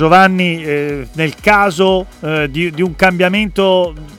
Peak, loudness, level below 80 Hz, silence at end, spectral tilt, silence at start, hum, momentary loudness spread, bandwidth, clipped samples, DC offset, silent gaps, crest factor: 0 dBFS; -13 LUFS; -36 dBFS; 0 s; -5.5 dB/octave; 0 s; none; 8 LU; 15.5 kHz; under 0.1%; under 0.1%; none; 12 dB